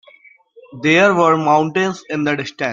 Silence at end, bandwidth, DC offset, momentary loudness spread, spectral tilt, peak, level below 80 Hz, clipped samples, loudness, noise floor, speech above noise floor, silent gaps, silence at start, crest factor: 0 s; 7.6 kHz; under 0.1%; 9 LU; -5.5 dB/octave; -2 dBFS; -62 dBFS; under 0.1%; -15 LUFS; -48 dBFS; 32 dB; none; 0.7 s; 16 dB